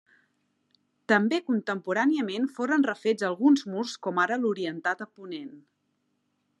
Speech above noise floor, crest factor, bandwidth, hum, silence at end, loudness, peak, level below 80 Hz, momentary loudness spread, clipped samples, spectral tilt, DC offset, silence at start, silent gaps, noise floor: 49 dB; 20 dB; 10.5 kHz; 50 Hz at -65 dBFS; 1 s; -26 LUFS; -8 dBFS; -86 dBFS; 16 LU; under 0.1%; -5 dB/octave; under 0.1%; 1.1 s; none; -75 dBFS